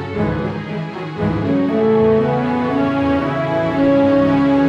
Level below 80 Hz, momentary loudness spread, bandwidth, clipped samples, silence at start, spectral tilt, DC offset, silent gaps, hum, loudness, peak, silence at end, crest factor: -40 dBFS; 9 LU; 6.6 kHz; under 0.1%; 0 s; -8.5 dB/octave; under 0.1%; none; none; -17 LUFS; -2 dBFS; 0 s; 14 dB